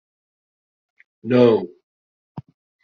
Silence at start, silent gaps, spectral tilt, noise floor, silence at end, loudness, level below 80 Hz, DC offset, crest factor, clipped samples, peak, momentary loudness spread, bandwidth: 1.25 s; 1.83-2.35 s; -6.5 dB/octave; under -90 dBFS; 0.45 s; -17 LUFS; -66 dBFS; under 0.1%; 20 dB; under 0.1%; -2 dBFS; 26 LU; 6.4 kHz